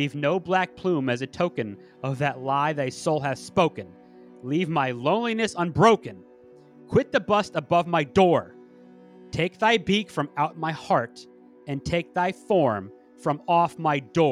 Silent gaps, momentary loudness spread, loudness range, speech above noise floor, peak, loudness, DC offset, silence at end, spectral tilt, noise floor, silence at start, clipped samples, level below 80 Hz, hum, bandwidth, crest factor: none; 13 LU; 3 LU; 27 dB; -4 dBFS; -24 LUFS; under 0.1%; 0 s; -6 dB/octave; -51 dBFS; 0 s; under 0.1%; -56 dBFS; none; 12 kHz; 20 dB